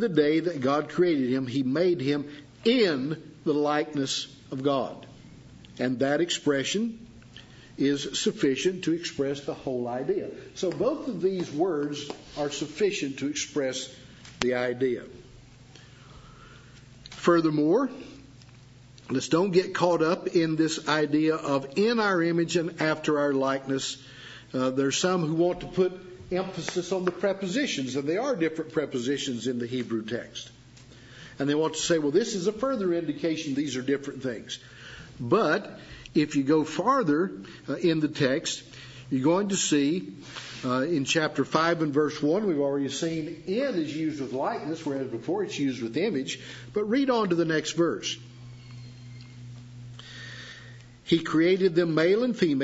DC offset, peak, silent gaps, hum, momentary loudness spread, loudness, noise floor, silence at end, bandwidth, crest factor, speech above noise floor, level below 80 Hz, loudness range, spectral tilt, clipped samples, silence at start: under 0.1%; 0 dBFS; none; none; 18 LU; -27 LUFS; -51 dBFS; 0 s; 8 kHz; 26 dB; 24 dB; -62 dBFS; 5 LU; -5 dB/octave; under 0.1%; 0 s